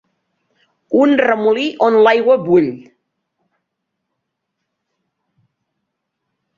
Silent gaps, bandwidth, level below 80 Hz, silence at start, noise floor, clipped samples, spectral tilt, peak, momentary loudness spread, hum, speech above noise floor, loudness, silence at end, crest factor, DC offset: none; 7.2 kHz; -64 dBFS; 0.9 s; -76 dBFS; under 0.1%; -6.5 dB/octave; 0 dBFS; 7 LU; none; 63 dB; -13 LUFS; 3.8 s; 18 dB; under 0.1%